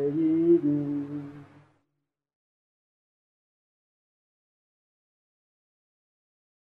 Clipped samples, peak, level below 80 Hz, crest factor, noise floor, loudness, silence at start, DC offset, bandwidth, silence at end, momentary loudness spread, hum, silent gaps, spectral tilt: under 0.1%; -12 dBFS; -76 dBFS; 20 dB; -82 dBFS; -25 LUFS; 0 s; under 0.1%; 3.3 kHz; 5.25 s; 17 LU; none; none; -11.5 dB/octave